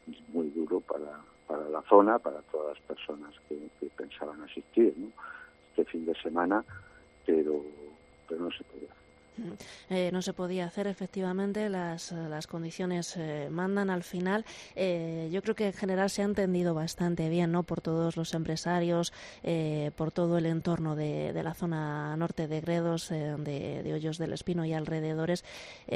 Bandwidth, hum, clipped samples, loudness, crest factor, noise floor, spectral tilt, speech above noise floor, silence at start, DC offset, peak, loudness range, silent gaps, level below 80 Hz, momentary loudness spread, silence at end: 13.5 kHz; none; under 0.1%; -32 LUFS; 26 dB; -58 dBFS; -6.5 dB/octave; 27 dB; 0.05 s; under 0.1%; -6 dBFS; 5 LU; none; -62 dBFS; 14 LU; 0 s